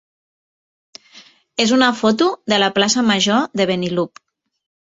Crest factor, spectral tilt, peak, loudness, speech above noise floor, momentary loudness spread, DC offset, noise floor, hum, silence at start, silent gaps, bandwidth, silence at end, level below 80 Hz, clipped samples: 18 dB; -3.5 dB/octave; 0 dBFS; -16 LUFS; 31 dB; 8 LU; under 0.1%; -47 dBFS; none; 1.15 s; none; 8 kHz; 0.8 s; -60 dBFS; under 0.1%